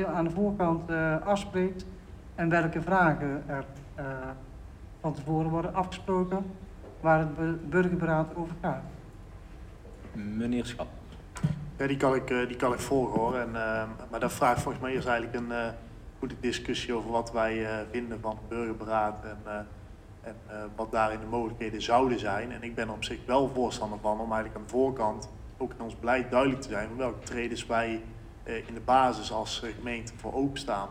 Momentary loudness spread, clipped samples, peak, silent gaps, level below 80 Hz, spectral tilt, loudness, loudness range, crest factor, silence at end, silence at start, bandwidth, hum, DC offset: 18 LU; under 0.1%; -12 dBFS; none; -48 dBFS; -6 dB/octave; -30 LUFS; 4 LU; 20 dB; 0 s; 0 s; 16 kHz; none; under 0.1%